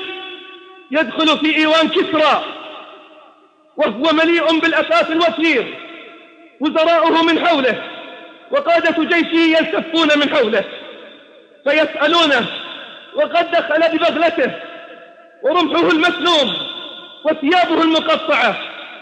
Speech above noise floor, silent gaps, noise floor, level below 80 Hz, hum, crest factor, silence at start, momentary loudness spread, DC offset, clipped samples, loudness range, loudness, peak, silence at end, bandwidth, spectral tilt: 35 dB; none; -49 dBFS; -66 dBFS; none; 14 dB; 0 s; 18 LU; under 0.1%; under 0.1%; 2 LU; -15 LUFS; -2 dBFS; 0 s; 9.2 kHz; -4 dB/octave